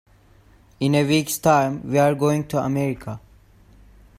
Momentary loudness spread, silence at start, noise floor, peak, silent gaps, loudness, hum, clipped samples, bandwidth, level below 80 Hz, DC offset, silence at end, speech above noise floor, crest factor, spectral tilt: 11 LU; 0.8 s; -53 dBFS; -4 dBFS; none; -20 LUFS; none; under 0.1%; 16 kHz; -52 dBFS; under 0.1%; 1 s; 33 dB; 18 dB; -5.5 dB/octave